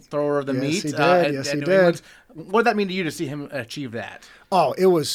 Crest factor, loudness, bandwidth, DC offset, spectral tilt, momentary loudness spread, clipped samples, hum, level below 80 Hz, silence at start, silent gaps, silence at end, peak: 16 dB; -21 LUFS; 16 kHz; under 0.1%; -5 dB/octave; 13 LU; under 0.1%; none; -62 dBFS; 0.1 s; none; 0 s; -6 dBFS